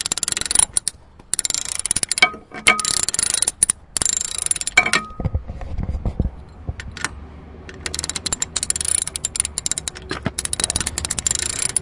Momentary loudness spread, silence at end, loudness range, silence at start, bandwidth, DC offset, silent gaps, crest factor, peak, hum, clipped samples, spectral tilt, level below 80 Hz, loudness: 14 LU; 0 s; 9 LU; 0 s; 12 kHz; under 0.1%; none; 22 dB; 0 dBFS; none; under 0.1%; -1 dB/octave; -36 dBFS; -19 LUFS